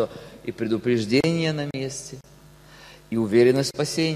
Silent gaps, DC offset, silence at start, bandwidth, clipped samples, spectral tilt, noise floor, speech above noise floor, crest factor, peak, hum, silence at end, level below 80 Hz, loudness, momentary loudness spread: none; under 0.1%; 0 s; 14.5 kHz; under 0.1%; -5.5 dB/octave; -49 dBFS; 26 dB; 18 dB; -6 dBFS; none; 0 s; -56 dBFS; -23 LUFS; 17 LU